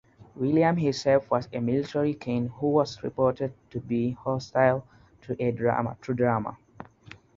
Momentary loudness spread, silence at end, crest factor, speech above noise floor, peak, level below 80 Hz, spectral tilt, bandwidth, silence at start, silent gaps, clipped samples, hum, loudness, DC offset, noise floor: 10 LU; 0.5 s; 20 dB; 25 dB; -8 dBFS; -58 dBFS; -7.5 dB/octave; 7.6 kHz; 0.2 s; none; under 0.1%; none; -27 LUFS; under 0.1%; -51 dBFS